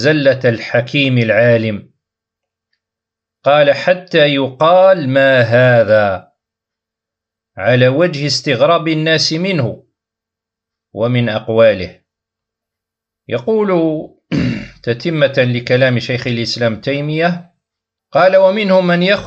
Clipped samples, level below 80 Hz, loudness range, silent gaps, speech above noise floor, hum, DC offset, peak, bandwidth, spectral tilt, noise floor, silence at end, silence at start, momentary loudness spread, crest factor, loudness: under 0.1%; -52 dBFS; 6 LU; none; 71 dB; none; under 0.1%; 0 dBFS; 8.4 kHz; -6 dB/octave; -83 dBFS; 0 s; 0 s; 10 LU; 14 dB; -13 LUFS